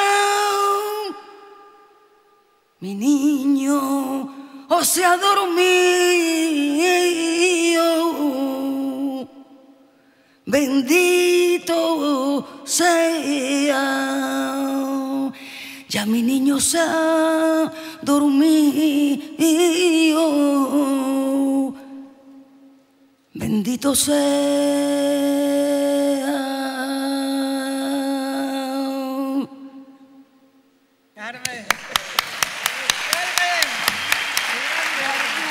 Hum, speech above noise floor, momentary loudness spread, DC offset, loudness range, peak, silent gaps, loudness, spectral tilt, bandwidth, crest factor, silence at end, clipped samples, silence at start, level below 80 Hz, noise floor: none; 42 dB; 11 LU; under 0.1%; 7 LU; 0 dBFS; none; -19 LUFS; -2.5 dB/octave; 16 kHz; 20 dB; 0 s; under 0.1%; 0 s; -62 dBFS; -59 dBFS